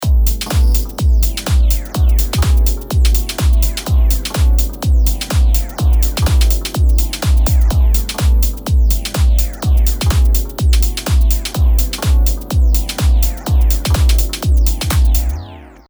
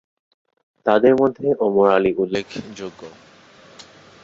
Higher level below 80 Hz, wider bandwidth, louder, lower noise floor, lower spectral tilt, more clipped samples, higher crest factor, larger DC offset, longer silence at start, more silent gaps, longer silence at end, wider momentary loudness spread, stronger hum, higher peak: first, -12 dBFS vs -58 dBFS; first, over 20 kHz vs 7.6 kHz; first, -15 LUFS vs -18 LUFS; second, -33 dBFS vs -48 dBFS; second, -5 dB/octave vs -6.5 dB/octave; neither; second, 12 dB vs 18 dB; neither; second, 0 s vs 0.85 s; neither; second, 0.2 s vs 1.15 s; second, 2 LU vs 18 LU; neither; about the same, 0 dBFS vs -2 dBFS